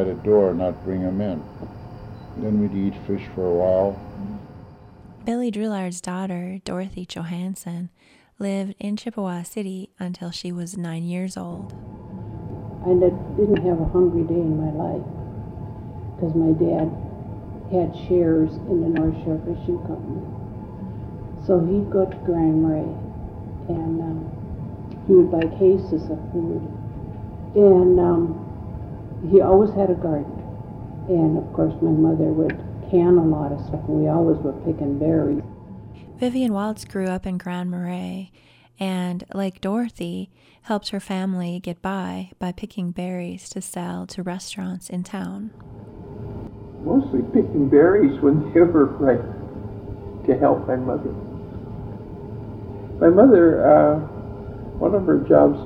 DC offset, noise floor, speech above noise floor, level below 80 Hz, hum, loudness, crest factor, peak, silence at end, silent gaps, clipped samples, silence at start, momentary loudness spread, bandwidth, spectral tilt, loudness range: under 0.1%; -44 dBFS; 24 dB; -42 dBFS; none; -21 LUFS; 20 dB; -2 dBFS; 0 s; none; under 0.1%; 0 s; 19 LU; 13.5 kHz; -8 dB/octave; 11 LU